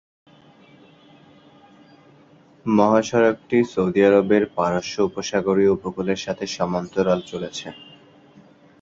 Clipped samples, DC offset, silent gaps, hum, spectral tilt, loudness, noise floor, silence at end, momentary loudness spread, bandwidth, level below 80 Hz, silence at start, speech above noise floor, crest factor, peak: under 0.1%; under 0.1%; none; none; -5.5 dB/octave; -21 LUFS; -52 dBFS; 1 s; 13 LU; 7.8 kHz; -56 dBFS; 2.65 s; 32 dB; 20 dB; -2 dBFS